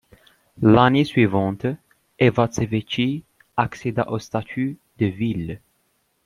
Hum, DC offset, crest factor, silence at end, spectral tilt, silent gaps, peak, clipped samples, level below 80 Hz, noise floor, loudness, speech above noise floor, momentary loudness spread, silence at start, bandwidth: none; under 0.1%; 20 dB; 0.7 s; -7 dB/octave; none; -2 dBFS; under 0.1%; -52 dBFS; -68 dBFS; -21 LUFS; 48 dB; 13 LU; 0.6 s; 12 kHz